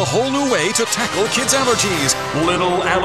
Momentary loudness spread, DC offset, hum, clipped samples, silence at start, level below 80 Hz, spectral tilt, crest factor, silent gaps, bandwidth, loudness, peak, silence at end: 3 LU; 0.4%; none; under 0.1%; 0 s; -46 dBFS; -3 dB/octave; 16 dB; none; 15 kHz; -16 LUFS; -2 dBFS; 0 s